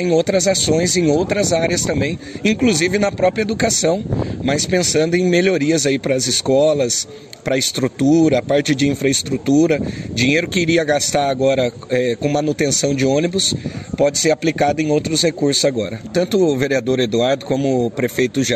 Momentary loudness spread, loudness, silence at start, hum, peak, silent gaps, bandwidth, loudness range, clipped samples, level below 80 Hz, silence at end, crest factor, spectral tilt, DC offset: 5 LU; -17 LUFS; 0 s; none; -2 dBFS; none; 14 kHz; 1 LU; under 0.1%; -42 dBFS; 0 s; 14 dB; -4 dB/octave; under 0.1%